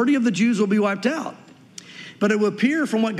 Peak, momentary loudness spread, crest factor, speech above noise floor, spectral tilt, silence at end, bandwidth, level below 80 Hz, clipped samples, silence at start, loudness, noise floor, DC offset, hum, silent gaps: -6 dBFS; 20 LU; 14 dB; 24 dB; -5.5 dB/octave; 0 s; 12 kHz; -76 dBFS; under 0.1%; 0 s; -21 LUFS; -44 dBFS; under 0.1%; none; none